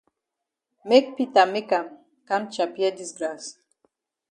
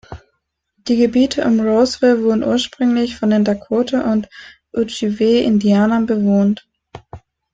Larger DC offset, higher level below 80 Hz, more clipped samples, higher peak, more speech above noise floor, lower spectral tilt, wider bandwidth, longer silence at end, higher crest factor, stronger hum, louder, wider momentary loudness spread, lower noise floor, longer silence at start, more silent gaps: neither; second, -78 dBFS vs -50 dBFS; neither; about the same, -4 dBFS vs -2 dBFS; first, 62 dB vs 55 dB; second, -3.5 dB/octave vs -6 dB/octave; first, 10.5 kHz vs 8.6 kHz; first, 0.8 s vs 0.35 s; first, 22 dB vs 14 dB; neither; second, -23 LUFS vs -16 LUFS; first, 18 LU vs 7 LU; first, -85 dBFS vs -70 dBFS; first, 0.85 s vs 0.1 s; neither